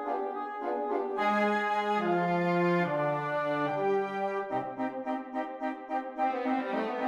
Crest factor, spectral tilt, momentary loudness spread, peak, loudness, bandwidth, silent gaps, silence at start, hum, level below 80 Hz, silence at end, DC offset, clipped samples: 14 dB; -7.5 dB/octave; 8 LU; -16 dBFS; -31 LUFS; 11 kHz; none; 0 s; none; -74 dBFS; 0 s; under 0.1%; under 0.1%